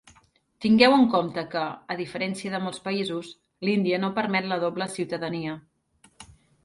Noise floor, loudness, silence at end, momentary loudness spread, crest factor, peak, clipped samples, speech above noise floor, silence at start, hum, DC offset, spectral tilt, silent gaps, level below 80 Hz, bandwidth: -61 dBFS; -25 LUFS; 0.4 s; 15 LU; 22 dB; -4 dBFS; under 0.1%; 37 dB; 0.6 s; none; under 0.1%; -5.5 dB/octave; none; -64 dBFS; 11.5 kHz